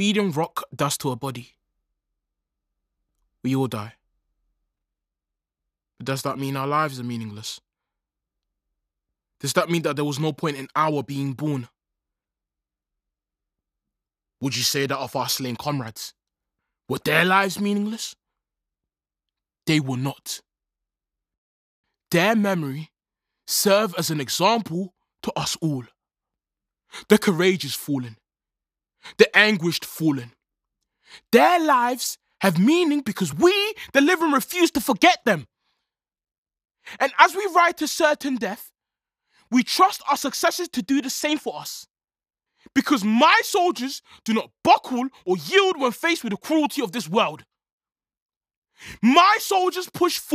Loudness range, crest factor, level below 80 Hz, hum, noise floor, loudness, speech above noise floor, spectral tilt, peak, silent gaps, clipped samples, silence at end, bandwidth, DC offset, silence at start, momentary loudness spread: 10 LU; 24 dB; -66 dBFS; none; under -90 dBFS; -21 LUFS; over 68 dB; -4 dB/octave; 0 dBFS; 21.38-21.84 s, 36.38-36.43 s, 47.72-47.78 s, 48.22-48.29 s, 48.37-48.41 s, 48.57-48.62 s; under 0.1%; 0 s; 15.5 kHz; under 0.1%; 0 s; 15 LU